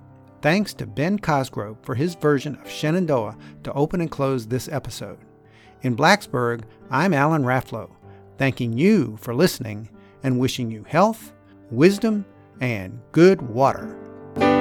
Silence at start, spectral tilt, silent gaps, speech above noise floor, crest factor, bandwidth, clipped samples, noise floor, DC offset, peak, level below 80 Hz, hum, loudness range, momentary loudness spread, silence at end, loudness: 0.45 s; -6 dB/octave; none; 29 dB; 20 dB; 18.5 kHz; under 0.1%; -50 dBFS; under 0.1%; -2 dBFS; -52 dBFS; none; 4 LU; 16 LU; 0 s; -22 LUFS